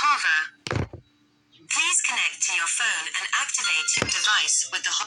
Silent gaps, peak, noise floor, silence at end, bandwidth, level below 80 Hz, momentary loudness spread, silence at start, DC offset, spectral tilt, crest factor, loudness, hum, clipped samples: none; -6 dBFS; -62 dBFS; 0 s; 17 kHz; -56 dBFS; 9 LU; 0 s; under 0.1%; 0 dB/octave; 20 dB; -22 LUFS; none; under 0.1%